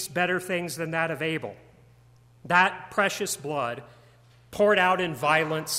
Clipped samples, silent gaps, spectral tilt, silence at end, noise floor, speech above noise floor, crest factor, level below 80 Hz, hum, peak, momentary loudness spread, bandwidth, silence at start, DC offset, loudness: under 0.1%; none; -3.5 dB/octave; 0 s; -56 dBFS; 31 dB; 20 dB; -64 dBFS; none; -6 dBFS; 11 LU; 16 kHz; 0 s; under 0.1%; -25 LUFS